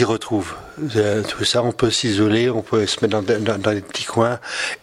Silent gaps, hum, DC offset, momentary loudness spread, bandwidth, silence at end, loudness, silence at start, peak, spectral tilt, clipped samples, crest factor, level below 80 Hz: none; none; under 0.1%; 7 LU; 15 kHz; 0.05 s; -20 LUFS; 0 s; -2 dBFS; -4.5 dB/octave; under 0.1%; 18 dB; -52 dBFS